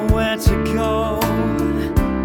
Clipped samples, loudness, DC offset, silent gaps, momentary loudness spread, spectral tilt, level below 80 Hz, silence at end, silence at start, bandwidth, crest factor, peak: under 0.1%; -19 LUFS; under 0.1%; none; 2 LU; -6.5 dB/octave; -24 dBFS; 0 s; 0 s; over 20 kHz; 16 dB; 0 dBFS